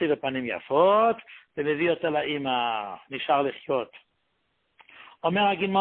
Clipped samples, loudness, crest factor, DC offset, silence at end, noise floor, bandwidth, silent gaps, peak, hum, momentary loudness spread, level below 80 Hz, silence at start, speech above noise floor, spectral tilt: under 0.1%; -26 LUFS; 18 dB; under 0.1%; 0 s; -74 dBFS; 4.4 kHz; none; -8 dBFS; none; 12 LU; -68 dBFS; 0 s; 49 dB; -9.5 dB/octave